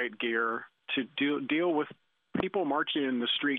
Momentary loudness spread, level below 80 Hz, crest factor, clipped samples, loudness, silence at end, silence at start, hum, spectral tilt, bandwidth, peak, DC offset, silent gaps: 6 LU; -70 dBFS; 20 dB; under 0.1%; -31 LUFS; 0 s; 0 s; none; -7.5 dB/octave; 4.3 kHz; -10 dBFS; under 0.1%; none